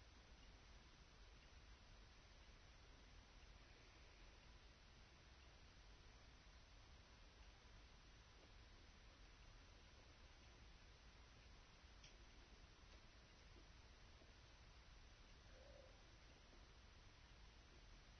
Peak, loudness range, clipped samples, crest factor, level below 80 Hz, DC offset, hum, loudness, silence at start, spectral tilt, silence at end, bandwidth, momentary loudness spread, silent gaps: -52 dBFS; 0 LU; under 0.1%; 14 dB; -68 dBFS; under 0.1%; none; -67 LUFS; 0 s; -3 dB/octave; 0 s; 6.4 kHz; 1 LU; none